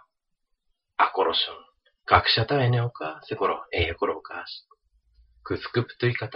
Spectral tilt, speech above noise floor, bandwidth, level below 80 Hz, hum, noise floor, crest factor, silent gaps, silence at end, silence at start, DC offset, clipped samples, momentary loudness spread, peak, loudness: -3 dB/octave; 51 dB; 5.6 kHz; -50 dBFS; none; -76 dBFS; 26 dB; none; 0 s; 1 s; under 0.1%; under 0.1%; 16 LU; -2 dBFS; -25 LUFS